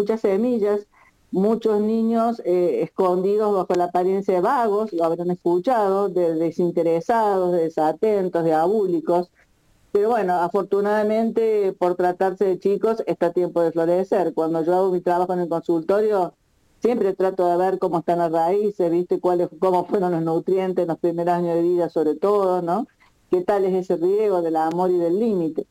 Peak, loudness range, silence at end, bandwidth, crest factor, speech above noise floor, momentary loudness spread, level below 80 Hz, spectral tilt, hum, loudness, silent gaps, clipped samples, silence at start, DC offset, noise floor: -8 dBFS; 1 LU; 0.1 s; 16 kHz; 12 dB; 39 dB; 3 LU; -66 dBFS; -8 dB/octave; none; -21 LUFS; none; under 0.1%; 0 s; under 0.1%; -59 dBFS